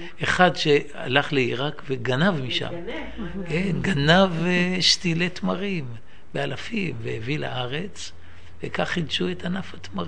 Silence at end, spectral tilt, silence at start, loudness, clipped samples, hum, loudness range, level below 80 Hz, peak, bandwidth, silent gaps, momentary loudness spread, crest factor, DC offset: 0 s; -5 dB/octave; 0 s; -23 LUFS; under 0.1%; none; 7 LU; -48 dBFS; -2 dBFS; 10.5 kHz; none; 15 LU; 24 dB; 2%